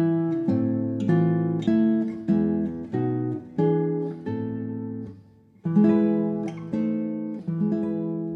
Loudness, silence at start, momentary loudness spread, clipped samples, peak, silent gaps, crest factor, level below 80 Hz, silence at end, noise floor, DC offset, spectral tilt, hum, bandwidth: -25 LUFS; 0 s; 9 LU; under 0.1%; -10 dBFS; none; 16 dB; -62 dBFS; 0 s; -52 dBFS; under 0.1%; -10.5 dB/octave; none; 4.9 kHz